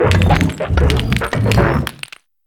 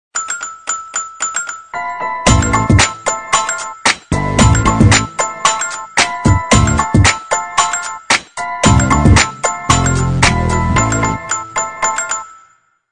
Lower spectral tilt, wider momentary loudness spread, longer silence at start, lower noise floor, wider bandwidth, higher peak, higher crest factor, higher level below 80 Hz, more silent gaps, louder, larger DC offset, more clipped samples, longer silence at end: first, -6 dB/octave vs -4 dB/octave; about the same, 12 LU vs 10 LU; second, 0 s vs 0.15 s; second, -36 dBFS vs -51 dBFS; first, 17 kHz vs 12 kHz; about the same, 0 dBFS vs 0 dBFS; about the same, 14 dB vs 14 dB; about the same, -24 dBFS vs -24 dBFS; neither; about the same, -15 LUFS vs -14 LUFS; second, under 0.1% vs 0.5%; second, under 0.1% vs 0.3%; about the same, 0.55 s vs 0.55 s